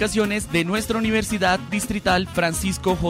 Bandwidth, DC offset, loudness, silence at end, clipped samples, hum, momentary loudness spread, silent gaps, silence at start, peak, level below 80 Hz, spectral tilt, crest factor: 16 kHz; under 0.1%; -22 LUFS; 0 s; under 0.1%; none; 3 LU; none; 0 s; -8 dBFS; -38 dBFS; -4.5 dB/octave; 14 dB